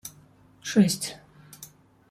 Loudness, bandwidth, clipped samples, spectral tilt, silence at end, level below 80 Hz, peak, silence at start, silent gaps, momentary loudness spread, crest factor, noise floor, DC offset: -25 LUFS; 15.5 kHz; under 0.1%; -5 dB/octave; 0.45 s; -66 dBFS; -8 dBFS; 0.05 s; none; 24 LU; 22 dB; -56 dBFS; under 0.1%